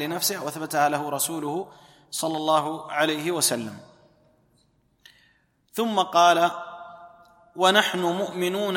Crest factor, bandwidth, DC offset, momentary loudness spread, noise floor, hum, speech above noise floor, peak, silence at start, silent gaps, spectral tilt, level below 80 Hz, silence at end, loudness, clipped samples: 20 dB; 16.5 kHz; under 0.1%; 18 LU; -65 dBFS; none; 41 dB; -6 dBFS; 0 s; none; -3 dB/octave; -72 dBFS; 0 s; -23 LUFS; under 0.1%